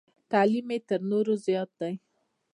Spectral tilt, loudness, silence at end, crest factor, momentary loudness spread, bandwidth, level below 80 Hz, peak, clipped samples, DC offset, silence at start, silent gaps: -7 dB/octave; -28 LUFS; 0.6 s; 18 dB; 11 LU; 10.5 kHz; -82 dBFS; -10 dBFS; under 0.1%; under 0.1%; 0.3 s; none